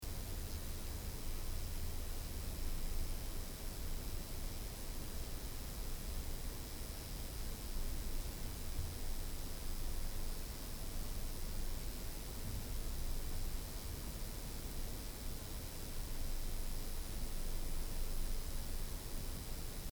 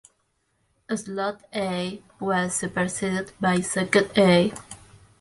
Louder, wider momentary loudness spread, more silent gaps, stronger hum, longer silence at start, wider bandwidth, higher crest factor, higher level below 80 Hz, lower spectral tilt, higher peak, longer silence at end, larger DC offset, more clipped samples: second, -46 LUFS vs -24 LUFS; second, 2 LU vs 14 LU; neither; neither; second, 0 s vs 0.9 s; first, over 20 kHz vs 11.5 kHz; second, 14 dB vs 20 dB; first, -42 dBFS vs -58 dBFS; about the same, -4 dB/octave vs -4.5 dB/octave; second, -28 dBFS vs -4 dBFS; second, 0.05 s vs 0.45 s; neither; neither